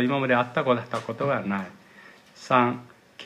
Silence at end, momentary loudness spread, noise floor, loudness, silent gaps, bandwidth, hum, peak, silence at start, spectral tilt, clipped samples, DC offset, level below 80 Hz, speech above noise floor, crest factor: 0 s; 14 LU; -51 dBFS; -25 LUFS; none; 10.5 kHz; none; -6 dBFS; 0 s; -6.5 dB/octave; under 0.1%; under 0.1%; -72 dBFS; 26 dB; 20 dB